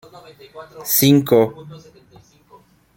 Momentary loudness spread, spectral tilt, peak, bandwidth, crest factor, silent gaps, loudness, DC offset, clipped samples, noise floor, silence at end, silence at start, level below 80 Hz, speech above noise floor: 26 LU; -5 dB/octave; -2 dBFS; 17 kHz; 18 dB; none; -15 LUFS; under 0.1%; under 0.1%; -51 dBFS; 1.2 s; 0.55 s; -58 dBFS; 32 dB